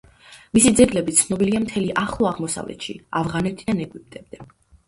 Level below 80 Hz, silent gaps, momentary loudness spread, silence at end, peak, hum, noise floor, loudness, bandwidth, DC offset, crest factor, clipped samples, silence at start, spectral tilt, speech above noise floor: -46 dBFS; none; 17 LU; 0.45 s; 0 dBFS; none; -48 dBFS; -20 LUFS; 11.5 kHz; under 0.1%; 20 dB; under 0.1%; 0.3 s; -4 dB/octave; 27 dB